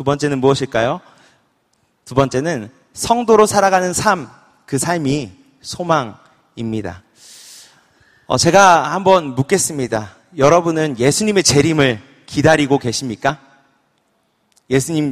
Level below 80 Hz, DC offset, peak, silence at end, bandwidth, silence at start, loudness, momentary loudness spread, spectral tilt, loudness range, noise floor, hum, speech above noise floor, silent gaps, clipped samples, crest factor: -48 dBFS; under 0.1%; 0 dBFS; 0 s; 15.5 kHz; 0 s; -15 LUFS; 16 LU; -4.5 dB/octave; 8 LU; -63 dBFS; none; 48 dB; none; under 0.1%; 16 dB